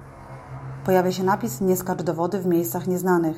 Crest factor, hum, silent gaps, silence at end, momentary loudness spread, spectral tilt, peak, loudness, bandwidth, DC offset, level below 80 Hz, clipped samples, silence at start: 16 dB; none; none; 0 s; 17 LU; -6.5 dB/octave; -6 dBFS; -23 LUFS; 16.5 kHz; under 0.1%; -54 dBFS; under 0.1%; 0 s